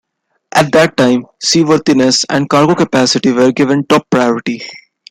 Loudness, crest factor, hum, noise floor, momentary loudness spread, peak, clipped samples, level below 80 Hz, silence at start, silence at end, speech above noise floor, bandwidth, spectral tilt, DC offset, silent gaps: -11 LUFS; 12 dB; none; -38 dBFS; 5 LU; 0 dBFS; under 0.1%; -52 dBFS; 0.55 s; 0.35 s; 27 dB; 15.5 kHz; -4.5 dB/octave; under 0.1%; none